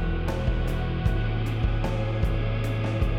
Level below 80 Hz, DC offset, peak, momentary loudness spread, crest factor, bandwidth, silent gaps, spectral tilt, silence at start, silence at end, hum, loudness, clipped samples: -28 dBFS; under 0.1%; -10 dBFS; 1 LU; 14 dB; 12.5 kHz; none; -7.5 dB/octave; 0 s; 0 s; none; -27 LUFS; under 0.1%